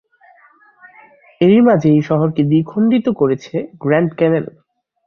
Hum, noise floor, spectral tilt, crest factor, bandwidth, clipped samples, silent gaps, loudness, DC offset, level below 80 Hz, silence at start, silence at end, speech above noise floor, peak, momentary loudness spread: none; -49 dBFS; -9 dB/octave; 14 dB; 6.8 kHz; under 0.1%; none; -15 LUFS; under 0.1%; -56 dBFS; 1.4 s; 0.6 s; 36 dB; -2 dBFS; 10 LU